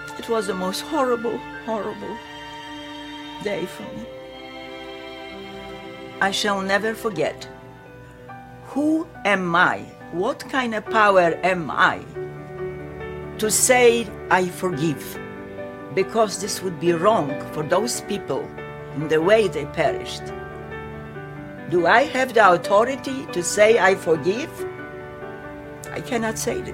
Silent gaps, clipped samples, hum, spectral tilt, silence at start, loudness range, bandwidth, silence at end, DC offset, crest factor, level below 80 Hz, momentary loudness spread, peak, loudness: none; under 0.1%; none; -3.5 dB/octave; 0 s; 9 LU; 16.5 kHz; 0 s; under 0.1%; 22 dB; -52 dBFS; 19 LU; -2 dBFS; -21 LUFS